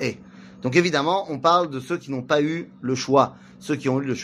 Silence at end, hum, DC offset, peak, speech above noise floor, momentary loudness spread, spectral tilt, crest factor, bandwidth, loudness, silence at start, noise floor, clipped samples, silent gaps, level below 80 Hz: 0 s; none; under 0.1%; -4 dBFS; 22 dB; 10 LU; -5.5 dB/octave; 20 dB; 12.5 kHz; -22 LUFS; 0 s; -44 dBFS; under 0.1%; none; -62 dBFS